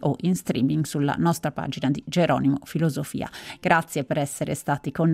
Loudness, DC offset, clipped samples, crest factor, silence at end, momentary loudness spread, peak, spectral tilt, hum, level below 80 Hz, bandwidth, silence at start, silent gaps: -25 LUFS; under 0.1%; under 0.1%; 20 dB; 0 s; 8 LU; -4 dBFS; -6 dB/octave; none; -56 dBFS; 16 kHz; 0 s; none